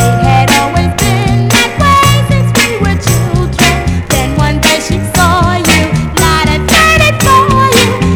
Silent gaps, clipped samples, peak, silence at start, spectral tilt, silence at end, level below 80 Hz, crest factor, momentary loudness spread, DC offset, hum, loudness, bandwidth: none; 0.8%; 0 dBFS; 0 s; -4.5 dB/octave; 0 s; -20 dBFS; 8 dB; 6 LU; under 0.1%; none; -8 LUFS; over 20 kHz